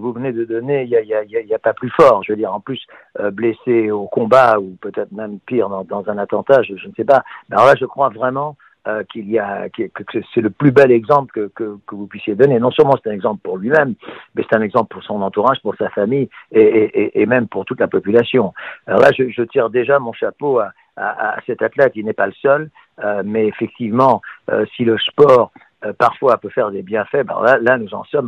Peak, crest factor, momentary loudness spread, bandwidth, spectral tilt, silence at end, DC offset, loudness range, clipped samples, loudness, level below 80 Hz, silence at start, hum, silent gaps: 0 dBFS; 16 dB; 14 LU; 8.6 kHz; -7.5 dB/octave; 0 s; under 0.1%; 3 LU; under 0.1%; -16 LUFS; -58 dBFS; 0 s; none; none